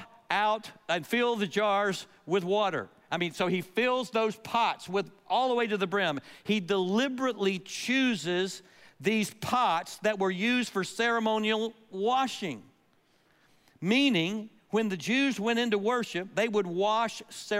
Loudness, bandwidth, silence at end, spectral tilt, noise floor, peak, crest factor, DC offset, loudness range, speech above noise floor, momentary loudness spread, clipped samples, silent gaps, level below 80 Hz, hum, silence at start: -29 LUFS; 16 kHz; 0 s; -4.5 dB/octave; -67 dBFS; -12 dBFS; 18 dB; under 0.1%; 2 LU; 38 dB; 7 LU; under 0.1%; none; -76 dBFS; none; 0 s